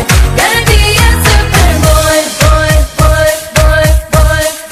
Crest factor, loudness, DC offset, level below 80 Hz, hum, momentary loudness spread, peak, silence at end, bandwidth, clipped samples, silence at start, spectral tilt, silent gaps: 8 dB; -8 LUFS; under 0.1%; -10 dBFS; none; 3 LU; 0 dBFS; 0 s; 16 kHz; 1%; 0 s; -4 dB/octave; none